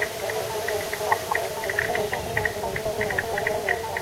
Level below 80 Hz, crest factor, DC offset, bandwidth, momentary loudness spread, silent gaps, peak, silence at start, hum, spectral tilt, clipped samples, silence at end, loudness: -48 dBFS; 20 dB; under 0.1%; 16 kHz; 3 LU; none; -6 dBFS; 0 s; none; -3 dB/octave; under 0.1%; 0 s; -26 LUFS